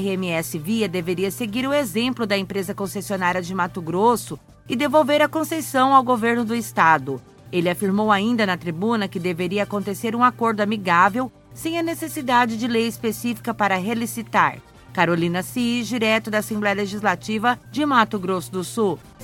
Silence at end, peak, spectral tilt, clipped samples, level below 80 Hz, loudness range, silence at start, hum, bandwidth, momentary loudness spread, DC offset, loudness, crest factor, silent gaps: 0 s; 0 dBFS; -5 dB/octave; under 0.1%; -56 dBFS; 4 LU; 0 s; none; 17.5 kHz; 9 LU; under 0.1%; -21 LUFS; 20 dB; none